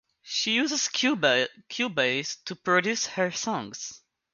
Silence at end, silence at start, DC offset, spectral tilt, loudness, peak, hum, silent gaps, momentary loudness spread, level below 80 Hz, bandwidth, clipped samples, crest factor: 0.35 s; 0.25 s; under 0.1%; -2.5 dB/octave; -26 LUFS; -8 dBFS; none; none; 10 LU; -74 dBFS; 10.5 kHz; under 0.1%; 20 dB